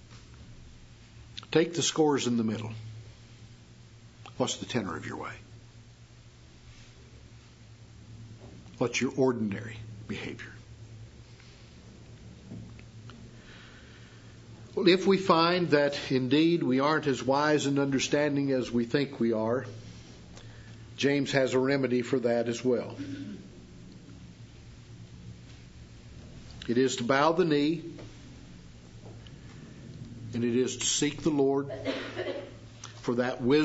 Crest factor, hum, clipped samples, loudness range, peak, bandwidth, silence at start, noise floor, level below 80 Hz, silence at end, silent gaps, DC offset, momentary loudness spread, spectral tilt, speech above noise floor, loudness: 24 dB; none; under 0.1%; 19 LU; -6 dBFS; 8 kHz; 0.1 s; -53 dBFS; -58 dBFS; 0 s; none; under 0.1%; 25 LU; -4.5 dB/octave; 25 dB; -28 LUFS